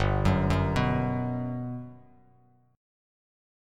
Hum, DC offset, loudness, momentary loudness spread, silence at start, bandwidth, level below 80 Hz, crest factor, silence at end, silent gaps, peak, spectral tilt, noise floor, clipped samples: 50 Hz at -60 dBFS; under 0.1%; -28 LUFS; 13 LU; 0 s; 11 kHz; -40 dBFS; 20 dB; 1.75 s; none; -10 dBFS; -7.5 dB/octave; -62 dBFS; under 0.1%